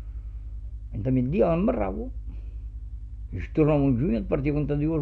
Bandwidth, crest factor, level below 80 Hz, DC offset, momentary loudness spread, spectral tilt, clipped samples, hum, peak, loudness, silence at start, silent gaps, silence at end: 4.5 kHz; 16 dB; -36 dBFS; under 0.1%; 17 LU; -11 dB/octave; under 0.1%; 50 Hz at -35 dBFS; -10 dBFS; -25 LUFS; 0 s; none; 0 s